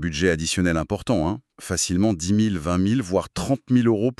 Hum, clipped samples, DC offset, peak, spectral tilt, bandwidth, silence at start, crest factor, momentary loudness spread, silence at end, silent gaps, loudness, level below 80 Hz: none; under 0.1%; under 0.1%; -6 dBFS; -5 dB/octave; 13 kHz; 0 s; 16 dB; 6 LU; 0.05 s; none; -22 LUFS; -42 dBFS